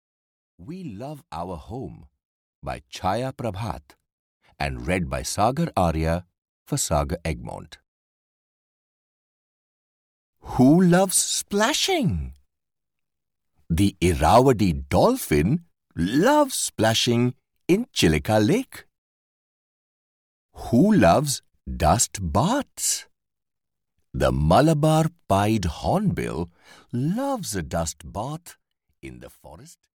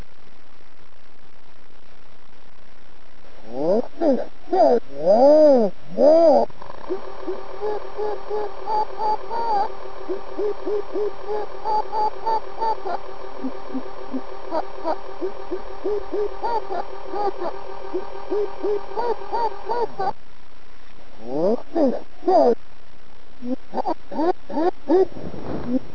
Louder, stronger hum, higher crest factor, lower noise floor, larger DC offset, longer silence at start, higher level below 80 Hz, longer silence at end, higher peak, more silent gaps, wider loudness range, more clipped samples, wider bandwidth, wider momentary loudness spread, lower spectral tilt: about the same, -22 LUFS vs -23 LUFS; neither; about the same, 18 dB vs 18 dB; first, -88 dBFS vs -49 dBFS; second, under 0.1% vs 7%; second, 0.6 s vs 3.35 s; first, -40 dBFS vs -52 dBFS; first, 0.35 s vs 0 s; about the same, -6 dBFS vs -4 dBFS; first, 2.25-2.62 s, 4.12-4.40 s, 6.38-6.66 s, 7.88-10.33 s, 18.98-20.49 s vs none; about the same, 10 LU vs 11 LU; neither; first, 19 kHz vs 5.4 kHz; first, 18 LU vs 15 LU; second, -5 dB/octave vs -7.5 dB/octave